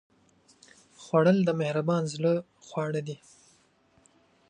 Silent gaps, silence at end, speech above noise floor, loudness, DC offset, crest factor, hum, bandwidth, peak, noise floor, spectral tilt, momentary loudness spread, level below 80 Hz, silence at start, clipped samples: none; 1.35 s; 38 dB; -27 LUFS; under 0.1%; 20 dB; none; 9.8 kHz; -10 dBFS; -65 dBFS; -7 dB/octave; 17 LU; -74 dBFS; 1 s; under 0.1%